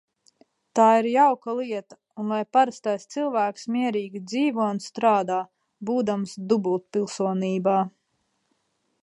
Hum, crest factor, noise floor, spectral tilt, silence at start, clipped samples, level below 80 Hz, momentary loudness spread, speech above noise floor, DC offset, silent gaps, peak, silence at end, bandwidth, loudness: none; 18 dB; -73 dBFS; -6 dB/octave; 0.75 s; under 0.1%; -78 dBFS; 11 LU; 50 dB; under 0.1%; none; -6 dBFS; 1.15 s; 11.5 kHz; -24 LUFS